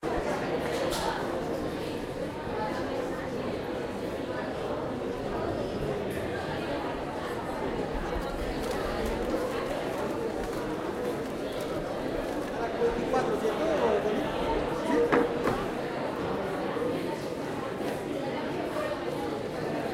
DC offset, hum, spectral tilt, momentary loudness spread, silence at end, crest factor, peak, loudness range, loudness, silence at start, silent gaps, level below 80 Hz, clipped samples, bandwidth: under 0.1%; none; -5.5 dB/octave; 6 LU; 0 s; 20 dB; -10 dBFS; 5 LU; -31 LUFS; 0 s; none; -46 dBFS; under 0.1%; 16 kHz